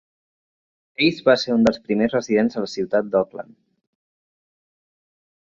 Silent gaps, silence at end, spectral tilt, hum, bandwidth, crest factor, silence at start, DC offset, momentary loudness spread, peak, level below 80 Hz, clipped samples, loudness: none; 2.15 s; -5.5 dB/octave; none; 7.6 kHz; 22 dB; 1 s; under 0.1%; 10 LU; -2 dBFS; -58 dBFS; under 0.1%; -20 LUFS